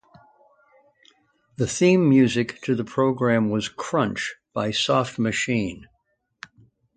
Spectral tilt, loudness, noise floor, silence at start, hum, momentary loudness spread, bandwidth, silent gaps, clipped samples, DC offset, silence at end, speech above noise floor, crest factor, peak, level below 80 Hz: -5.5 dB/octave; -22 LUFS; -71 dBFS; 1.6 s; none; 11 LU; 9.4 kHz; none; under 0.1%; under 0.1%; 1.15 s; 50 dB; 18 dB; -6 dBFS; -56 dBFS